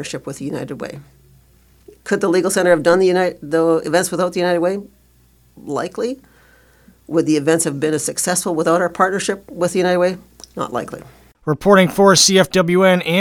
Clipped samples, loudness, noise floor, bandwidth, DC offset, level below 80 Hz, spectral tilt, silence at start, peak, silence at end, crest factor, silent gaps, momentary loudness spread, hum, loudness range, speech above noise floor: under 0.1%; -16 LUFS; -53 dBFS; 19 kHz; under 0.1%; -52 dBFS; -4 dB/octave; 0 s; 0 dBFS; 0 s; 18 dB; none; 16 LU; none; 7 LU; 37 dB